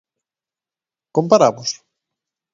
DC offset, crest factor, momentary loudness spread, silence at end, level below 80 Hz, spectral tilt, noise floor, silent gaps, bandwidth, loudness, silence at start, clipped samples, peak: under 0.1%; 20 dB; 13 LU; 0.8 s; -66 dBFS; -5 dB/octave; under -90 dBFS; none; 7.6 kHz; -17 LUFS; 1.15 s; under 0.1%; 0 dBFS